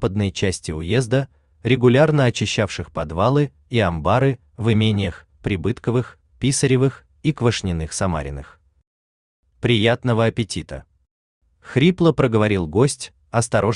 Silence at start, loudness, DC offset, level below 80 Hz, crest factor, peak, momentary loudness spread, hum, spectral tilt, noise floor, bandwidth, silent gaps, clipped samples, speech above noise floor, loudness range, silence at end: 0 s; -20 LUFS; under 0.1%; -44 dBFS; 18 dB; -2 dBFS; 11 LU; none; -5.5 dB/octave; under -90 dBFS; 11 kHz; 8.87-9.43 s, 11.11-11.41 s; under 0.1%; over 71 dB; 4 LU; 0 s